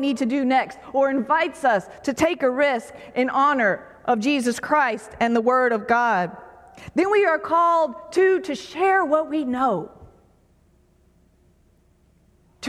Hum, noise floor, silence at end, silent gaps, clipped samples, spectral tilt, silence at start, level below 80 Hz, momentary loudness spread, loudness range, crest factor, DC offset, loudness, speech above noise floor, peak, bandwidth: none; -59 dBFS; 0 s; none; under 0.1%; -4.5 dB/octave; 0 s; -58 dBFS; 7 LU; 5 LU; 16 dB; under 0.1%; -21 LUFS; 38 dB; -6 dBFS; 14 kHz